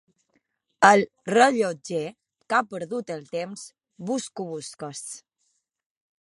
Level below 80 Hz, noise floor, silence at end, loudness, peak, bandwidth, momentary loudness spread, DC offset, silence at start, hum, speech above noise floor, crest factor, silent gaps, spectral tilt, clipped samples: -74 dBFS; -74 dBFS; 1.05 s; -24 LUFS; -2 dBFS; 11.5 kHz; 20 LU; under 0.1%; 0.8 s; none; 50 dB; 24 dB; none; -4 dB/octave; under 0.1%